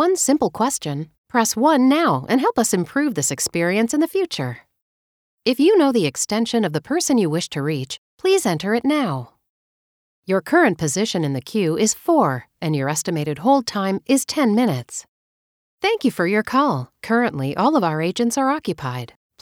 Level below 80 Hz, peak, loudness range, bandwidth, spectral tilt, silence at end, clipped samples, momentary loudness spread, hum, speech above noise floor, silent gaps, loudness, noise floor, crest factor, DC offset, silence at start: -62 dBFS; -4 dBFS; 3 LU; 18.5 kHz; -4.5 dB/octave; 0.35 s; under 0.1%; 10 LU; none; over 71 dB; 1.18-1.24 s, 4.82-5.38 s, 7.98-8.18 s, 9.49-10.23 s, 15.08-15.78 s; -20 LUFS; under -90 dBFS; 16 dB; under 0.1%; 0 s